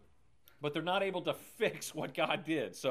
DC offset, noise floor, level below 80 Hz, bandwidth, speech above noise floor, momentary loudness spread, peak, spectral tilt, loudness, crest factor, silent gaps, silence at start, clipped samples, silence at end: under 0.1%; -68 dBFS; -76 dBFS; 15.5 kHz; 32 dB; 6 LU; -18 dBFS; -4 dB/octave; -36 LUFS; 20 dB; none; 0.6 s; under 0.1%; 0 s